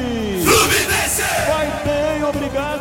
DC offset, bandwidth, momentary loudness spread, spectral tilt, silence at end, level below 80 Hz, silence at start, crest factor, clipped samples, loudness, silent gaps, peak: 0.2%; 17 kHz; 8 LU; -3 dB/octave; 0 s; -34 dBFS; 0 s; 18 dB; under 0.1%; -17 LUFS; none; 0 dBFS